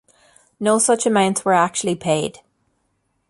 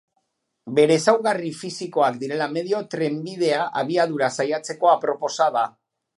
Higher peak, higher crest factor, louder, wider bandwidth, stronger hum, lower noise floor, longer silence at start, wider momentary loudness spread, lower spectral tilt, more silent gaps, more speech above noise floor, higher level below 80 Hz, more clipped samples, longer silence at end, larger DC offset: about the same, -4 dBFS vs -2 dBFS; about the same, 18 dB vs 20 dB; first, -18 LUFS vs -22 LUFS; about the same, 11.5 kHz vs 11.5 kHz; neither; second, -69 dBFS vs -73 dBFS; about the same, 0.6 s vs 0.65 s; about the same, 7 LU vs 8 LU; about the same, -3.5 dB/octave vs -4.5 dB/octave; neither; about the same, 51 dB vs 52 dB; first, -62 dBFS vs -76 dBFS; neither; first, 1 s vs 0.5 s; neither